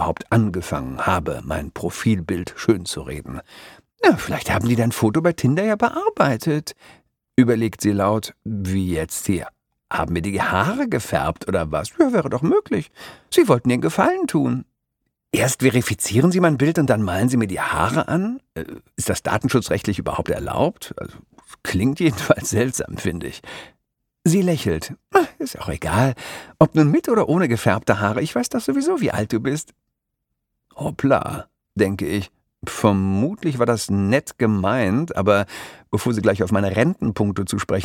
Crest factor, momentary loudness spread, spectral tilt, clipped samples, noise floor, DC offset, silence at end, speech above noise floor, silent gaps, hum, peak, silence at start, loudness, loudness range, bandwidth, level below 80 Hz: 20 dB; 12 LU; -6 dB/octave; under 0.1%; -78 dBFS; under 0.1%; 0 s; 58 dB; none; none; -2 dBFS; 0 s; -20 LUFS; 4 LU; 18.5 kHz; -46 dBFS